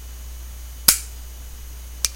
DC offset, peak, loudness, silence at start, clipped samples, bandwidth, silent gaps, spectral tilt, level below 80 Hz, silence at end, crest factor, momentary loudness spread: under 0.1%; 0 dBFS; -18 LUFS; 0 s; under 0.1%; 17 kHz; none; 0 dB/octave; -36 dBFS; 0 s; 26 dB; 21 LU